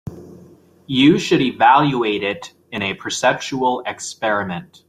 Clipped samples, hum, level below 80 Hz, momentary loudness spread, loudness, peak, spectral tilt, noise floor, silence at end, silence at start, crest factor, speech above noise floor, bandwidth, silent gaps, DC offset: under 0.1%; none; -56 dBFS; 14 LU; -18 LUFS; -2 dBFS; -4.5 dB/octave; -47 dBFS; 0.25 s; 0.05 s; 18 dB; 29 dB; 14 kHz; none; under 0.1%